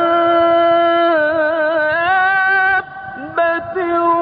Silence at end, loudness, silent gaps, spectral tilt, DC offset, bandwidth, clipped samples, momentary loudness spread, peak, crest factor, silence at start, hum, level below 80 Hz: 0 s; -14 LUFS; none; -9.5 dB/octave; under 0.1%; 5 kHz; under 0.1%; 7 LU; -4 dBFS; 10 dB; 0 s; none; -52 dBFS